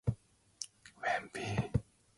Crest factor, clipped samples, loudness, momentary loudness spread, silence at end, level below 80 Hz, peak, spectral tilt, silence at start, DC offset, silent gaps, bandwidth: 22 dB; under 0.1%; -39 LUFS; 11 LU; 0.35 s; -52 dBFS; -18 dBFS; -5.5 dB/octave; 0.05 s; under 0.1%; none; 11.5 kHz